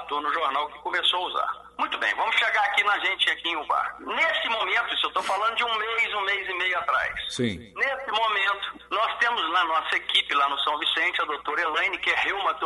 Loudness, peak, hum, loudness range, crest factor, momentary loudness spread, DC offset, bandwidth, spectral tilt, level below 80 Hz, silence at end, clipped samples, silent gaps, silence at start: -24 LUFS; -8 dBFS; 60 Hz at -60 dBFS; 2 LU; 18 dB; 6 LU; under 0.1%; 11.5 kHz; -2.5 dB/octave; -60 dBFS; 0 s; under 0.1%; none; 0 s